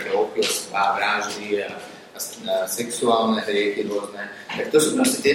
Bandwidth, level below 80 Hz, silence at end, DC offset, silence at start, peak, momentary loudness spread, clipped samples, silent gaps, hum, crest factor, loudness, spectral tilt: 16 kHz; -66 dBFS; 0 s; under 0.1%; 0 s; -4 dBFS; 13 LU; under 0.1%; none; none; 18 dB; -22 LUFS; -2.5 dB/octave